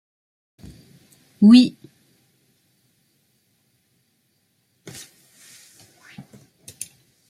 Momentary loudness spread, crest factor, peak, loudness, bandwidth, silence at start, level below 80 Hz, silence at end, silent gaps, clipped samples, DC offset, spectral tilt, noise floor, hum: 29 LU; 22 dB; -2 dBFS; -14 LUFS; 14 kHz; 1.4 s; -64 dBFS; 5.6 s; none; under 0.1%; under 0.1%; -5.5 dB/octave; -68 dBFS; none